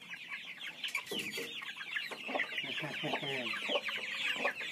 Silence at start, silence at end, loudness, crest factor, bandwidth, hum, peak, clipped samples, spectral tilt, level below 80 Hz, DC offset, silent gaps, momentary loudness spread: 0 s; 0 s; -37 LUFS; 20 dB; 15.5 kHz; none; -20 dBFS; under 0.1%; -2.5 dB/octave; -88 dBFS; under 0.1%; none; 7 LU